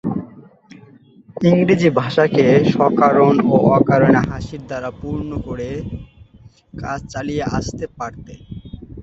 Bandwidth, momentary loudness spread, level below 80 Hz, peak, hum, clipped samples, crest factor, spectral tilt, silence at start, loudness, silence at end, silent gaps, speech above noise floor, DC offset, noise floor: 8 kHz; 18 LU; -40 dBFS; 0 dBFS; none; under 0.1%; 16 dB; -7.5 dB/octave; 0.05 s; -17 LUFS; 0 s; none; 30 dB; under 0.1%; -47 dBFS